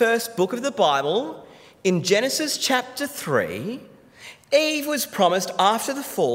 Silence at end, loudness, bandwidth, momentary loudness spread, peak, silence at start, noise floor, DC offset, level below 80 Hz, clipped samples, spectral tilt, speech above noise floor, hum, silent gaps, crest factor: 0 s; -22 LUFS; 16 kHz; 12 LU; -6 dBFS; 0 s; -46 dBFS; under 0.1%; -70 dBFS; under 0.1%; -3.5 dB/octave; 24 dB; none; none; 18 dB